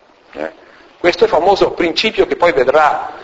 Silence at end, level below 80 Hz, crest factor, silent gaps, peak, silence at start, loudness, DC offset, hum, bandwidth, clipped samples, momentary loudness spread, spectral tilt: 0 s; -44 dBFS; 14 dB; none; 0 dBFS; 0.35 s; -13 LUFS; under 0.1%; none; 8 kHz; under 0.1%; 16 LU; -4.5 dB/octave